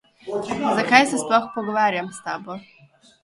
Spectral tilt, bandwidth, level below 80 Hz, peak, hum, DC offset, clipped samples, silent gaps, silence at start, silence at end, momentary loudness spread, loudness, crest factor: -3.5 dB/octave; 11.5 kHz; -64 dBFS; 0 dBFS; none; under 0.1%; under 0.1%; none; 0.25 s; 0.6 s; 15 LU; -21 LUFS; 22 dB